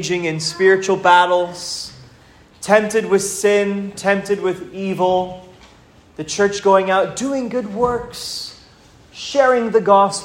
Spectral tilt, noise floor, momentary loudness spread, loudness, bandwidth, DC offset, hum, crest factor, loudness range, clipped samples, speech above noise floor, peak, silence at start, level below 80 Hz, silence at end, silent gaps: -4 dB/octave; -48 dBFS; 14 LU; -17 LUFS; 16 kHz; under 0.1%; none; 18 dB; 3 LU; under 0.1%; 31 dB; 0 dBFS; 0 s; -52 dBFS; 0 s; none